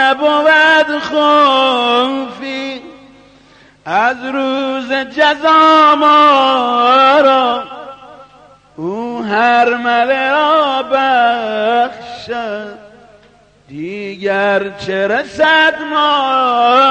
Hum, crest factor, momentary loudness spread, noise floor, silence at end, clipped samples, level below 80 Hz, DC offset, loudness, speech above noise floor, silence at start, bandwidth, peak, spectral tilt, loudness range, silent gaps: 50 Hz at -55 dBFS; 12 dB; 16 LU; -47 dBFS; 0 s; under 0.1%; -56 dBFS; under 0.1%; -12 LUFS; 35 dB; 0 s; 9.4 kHz; 0 dBFS; -4 dB/octave; 9 LU; none